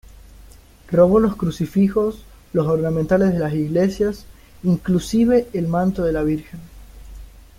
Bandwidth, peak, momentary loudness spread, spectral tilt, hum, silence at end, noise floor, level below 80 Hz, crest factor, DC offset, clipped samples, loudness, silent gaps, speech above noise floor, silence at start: 16 kHz; -2 dBFS; 9 LU; -8 dB/octave; none; 0.35 s; -45 dBFS; -40 dBFS; 18 dB; under 0.1%; under 0.1%; -19 LUFS; none; 27 dB; 0.9 s